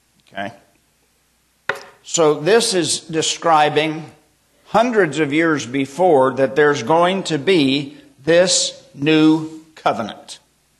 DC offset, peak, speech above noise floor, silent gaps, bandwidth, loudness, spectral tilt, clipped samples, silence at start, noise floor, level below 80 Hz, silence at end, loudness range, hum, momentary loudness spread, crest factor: under 0.1%; -2 dBFS; 45 dB; none; 13 kHz; -17 LUFS; -3.5 dB/octave; under 0.1%; 0.35 s; -61 dBFS; -62 dBFS; 0.45 s; 2 LU; none; 16 LU; 14 dB